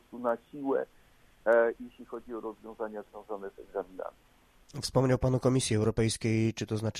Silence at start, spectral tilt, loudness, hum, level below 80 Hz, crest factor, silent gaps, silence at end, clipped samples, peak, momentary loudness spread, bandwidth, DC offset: 0.1 s; -5.5 dB/octave; -31 LUFS; none; -54 dBFS; 18 dB; none; 0 s; under 0.1%; -12 dBFS; 17 LU; 14.5 kHz; under 0.1%